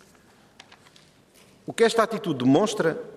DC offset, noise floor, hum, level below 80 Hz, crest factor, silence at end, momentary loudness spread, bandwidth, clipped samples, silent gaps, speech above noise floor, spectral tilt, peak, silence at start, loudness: under 0.1%; -56 dBFS; none; -66 dBFS; 18 dB; 0 s; 11 LU; 14 kHz; under 0.1%; none; 33 dB; -5 dB/octave; -8 dBFS; 1.7 s; -22 LUFS